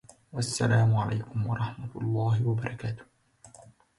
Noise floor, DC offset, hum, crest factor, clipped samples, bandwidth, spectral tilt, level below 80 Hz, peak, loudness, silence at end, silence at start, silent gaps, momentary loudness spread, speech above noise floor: -55 dBFS; under 0.1%; none; 16 dB; under 0.1%; 11.5 kHz; -6 dB/octave; -56 dBFS; -14 dBFS; -29 LUFS; 0.3 s; 0.35 s; none; 13 LU; 28 dB